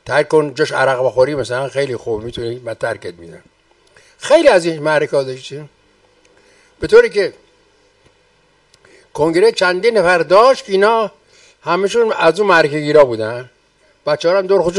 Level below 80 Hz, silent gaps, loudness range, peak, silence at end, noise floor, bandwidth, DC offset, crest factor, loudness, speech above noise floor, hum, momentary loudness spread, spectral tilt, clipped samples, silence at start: -50 dBFS; none; 6 LU; 0 dBFS; 0 s; -55 dBFS; 11.5 kHz; under 0.1%; 16 dB; -14 LUFS; 41 dB; none; 15 LU; -4.5 dB/octave; under 0.1%; 0.05 s